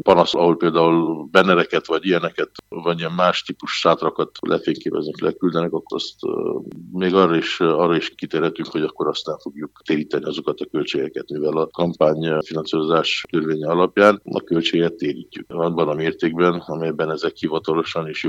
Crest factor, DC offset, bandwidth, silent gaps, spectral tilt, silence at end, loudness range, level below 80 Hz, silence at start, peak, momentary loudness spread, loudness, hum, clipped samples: 20 dB; under 0.1%; 8.4 kHz; none; -6 dB/octave; 0 s; 4 LU; -60 dBFS; 0.05 s; 0 dBFS; 10 LU; -20 LUFS; none; under 0.1%